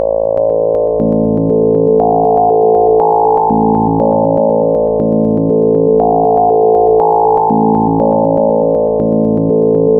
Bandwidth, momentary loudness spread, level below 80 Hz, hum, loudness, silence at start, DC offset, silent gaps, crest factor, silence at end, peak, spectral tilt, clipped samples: 2 kHz; 3 LU; -38 dBFS; none; -11 LUFS; 0 s; under 0.1%; none; 10 dB; 0 s; 0 dBFS; -14 dB/octave; under 0.1%